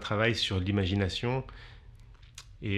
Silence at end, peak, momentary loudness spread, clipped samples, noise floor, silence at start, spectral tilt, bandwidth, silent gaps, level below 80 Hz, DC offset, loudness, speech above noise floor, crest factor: 0 s; -10 dBFS; 23 LU; under 0.1%; -52 dBFS; 0 s; -5.5 dB/octave; 12 kHz; none; -52 dBFS; under 0.1%; -30 LUFS; 22 dB; 20 dB